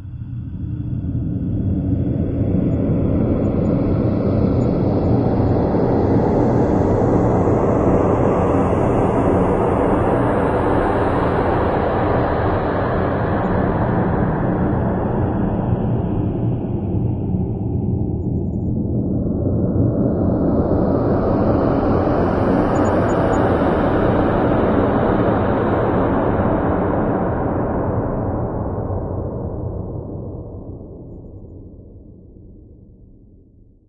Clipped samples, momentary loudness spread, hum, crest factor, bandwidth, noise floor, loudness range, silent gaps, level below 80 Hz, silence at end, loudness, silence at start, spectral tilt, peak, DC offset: under 0.1%; 8 LU; none; 16 dB; 7.4 kHz; -48 dBFS; 7 LU; none; -32 dBFS; 1.05 s; -18 LUFS; 0 s; -10 dB/octave; -2 dBFS; under 0.1%